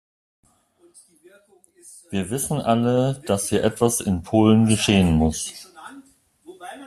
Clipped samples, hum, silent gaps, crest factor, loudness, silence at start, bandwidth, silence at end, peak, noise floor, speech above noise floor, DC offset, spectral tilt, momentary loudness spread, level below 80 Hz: under 0.1%; none; none; 20 dB; -20 LUFS; 1.85 s; 14.5 kHz; 0 s; -2 dBFS; -59 dBFS; 38 dB; under 0.1%; -5.5 dB/octave; 22 LU; -44 dBFS